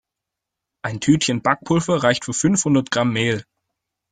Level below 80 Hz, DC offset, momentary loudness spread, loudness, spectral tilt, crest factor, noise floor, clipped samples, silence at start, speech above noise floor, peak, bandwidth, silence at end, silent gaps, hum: -54 dBFS; under 0.1%; 7 LU; -19 LUFS; -4.5 dB/octave; 20 dB; -84 dBFS; under 0.1%; 0.85 s; 65 dB; -2 dBFS; 9.6 kHz; 0.7 s; none; none